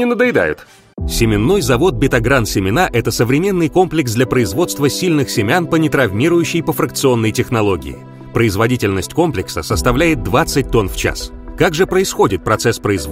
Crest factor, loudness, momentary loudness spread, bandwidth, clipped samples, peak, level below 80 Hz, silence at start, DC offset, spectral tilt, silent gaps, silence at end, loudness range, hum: 14 dB; -15 LUFS; 6 LU; 16.5 kHz; under 0.1%; 0 dBFS; -30 dBFS; 0 s; under 0.1%; -5 dB/octave; none; 0 s; 2 LU; none